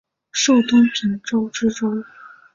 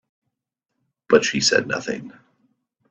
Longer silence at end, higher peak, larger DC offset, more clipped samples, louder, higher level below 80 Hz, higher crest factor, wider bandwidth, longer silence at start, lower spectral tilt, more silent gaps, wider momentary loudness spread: second, 0.5 s vs 0.8 s; about the same, -4 dBFS vs -2 dBFS; neither; neither; about the same, -18 LUFS vs -19 LUFS; about the same, -58 dBFS vs -62 dBFS; second, 14 dB vs 22 dB; second, 7.6 kHz vs 8.4 kHz; second, 0.35 s vs 1.1 s; about the same, -3.5 dB/octave vs -2.5 dB/octave; neither; about the same, 11 LU vs 13 LU